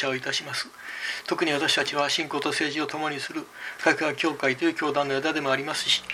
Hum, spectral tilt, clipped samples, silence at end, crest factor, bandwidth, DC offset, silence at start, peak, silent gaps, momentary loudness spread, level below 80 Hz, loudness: none; -2.5 dB/octave; under 0.1%; 0 s; 20 dB; 16 kHz; under 0.1%; 0 s; -6 dBFS; none; 9 LU; -70 dBFS; -26 LUFS